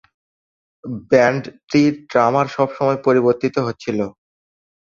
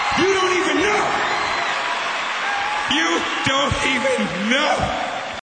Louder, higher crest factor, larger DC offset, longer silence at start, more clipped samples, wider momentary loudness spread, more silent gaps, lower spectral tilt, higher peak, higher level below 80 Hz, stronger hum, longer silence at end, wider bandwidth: about the same, -18 LUFS vs -19 LUFS; about the same, 18 dB vs 16 dB; neither; first, 0.85 s vs 0 s; neither; first, 13 LU vs 4 LU; first, 1.63-1.67 s vs none; first, -6.5 dB/octave vs -3 dB/octave; first, 0 dBFS vs -4 dBFS; second, -58 dBFS vs -44 dBFS; neither; first, 0.85 s vs 0.1 s; second, 7.4 kHz vs 9.2 kHz